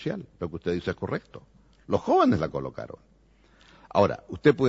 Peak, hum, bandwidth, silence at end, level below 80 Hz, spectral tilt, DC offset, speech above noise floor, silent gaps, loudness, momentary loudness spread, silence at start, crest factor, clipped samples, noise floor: -6 dBFS; none; 7.8 kHz; 0 s; -54 dBFS; -7.5 dB/octave; under 0.1%; 33 dB; none; -27 LUFS; 15 LU; 0 s; 20 dB; under 0.1%; -59 dBFS